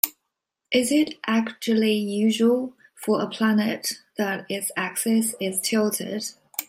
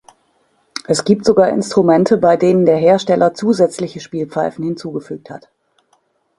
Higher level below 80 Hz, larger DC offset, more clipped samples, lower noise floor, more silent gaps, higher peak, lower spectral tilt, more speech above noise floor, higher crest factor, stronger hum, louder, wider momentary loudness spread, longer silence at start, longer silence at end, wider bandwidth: second, -72 dBFS vs -56 dBFS; neither; neither; first, -81 dBFS vs -61 dBFS; neither; about the same, 0 dBFS vs 0 dBFS; second, -3.5 dB/octave vs -6 dB/octave; first, 58 dB vs 47 dB; first, 24 dB vs 16 dB; neither; second, -24 LUFS vs -14 LUFS; second, 8 LU vs 18 LU; second, 0.05 s vs 0.75 s; second, 0.05 s vs 1 s; first, 16 kHz vs 11.5 kHz